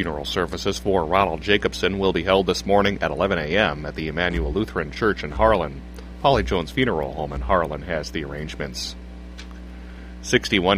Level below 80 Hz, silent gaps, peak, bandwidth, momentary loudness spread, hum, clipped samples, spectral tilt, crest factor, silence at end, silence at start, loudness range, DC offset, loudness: -36 dBFS; none; -2 dBFS; 15.5 kHz; 19 LU; none; under 0.1%; -5 dB/octave; 20 dB; 0 s; 0 s; 6 LU; under 0.1%; -22 LUFS